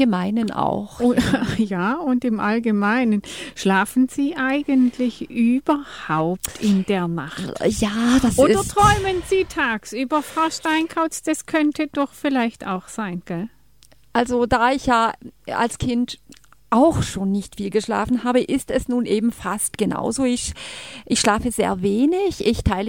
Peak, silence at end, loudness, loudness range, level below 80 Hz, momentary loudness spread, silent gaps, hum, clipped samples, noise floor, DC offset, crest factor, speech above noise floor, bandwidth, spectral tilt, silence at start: -2 dBFS; 0 s; -21 LUFS; 4 LU; -40 dBFS; 8 LU; none; none; under 0.1%; -55 dBFS; 0.2%; 18 dB; 34 dB; 17 kHz; -5 dB/octave; 0 s